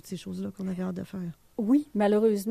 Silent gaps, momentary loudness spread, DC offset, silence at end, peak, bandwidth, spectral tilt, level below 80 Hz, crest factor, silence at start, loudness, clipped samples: none; 14 LU; under 0.1%; 0 s; -14 dBFS; 14.5 kHz; -7 dB/octave; -64 dBFS; 14 dB; 0.05 s; -28 LUFS; under 0.1%